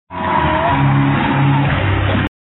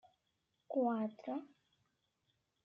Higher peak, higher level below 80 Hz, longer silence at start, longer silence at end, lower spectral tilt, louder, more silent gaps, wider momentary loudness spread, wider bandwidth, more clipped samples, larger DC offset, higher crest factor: first, -4 dBFS vs -24 dBFS; first, -32 dBFS vs under -90 dBFS; second, 0.1 s vs 0.7 s; second, 0.15 s vs 1.15 s; first, -10.5 dB/octave vs -7 dB/octave; first, -15 LUFS vs -40 LUFS; neither; second, 3 LU vs 9 LU; second, 4.1 kHz vs 5.6 kHz; neither; neither; second, 10 dB vs 18 dB